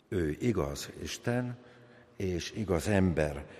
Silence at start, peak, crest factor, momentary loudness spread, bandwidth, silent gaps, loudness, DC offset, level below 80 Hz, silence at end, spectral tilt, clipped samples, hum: 0.1 s; -14 dBFS; 20 dB; 11 LU; 15.5 kHz; none; -32 LUFS; under 0.1%; -48 dBFS; 0 s; -6 dB/octave; under 0.1%; none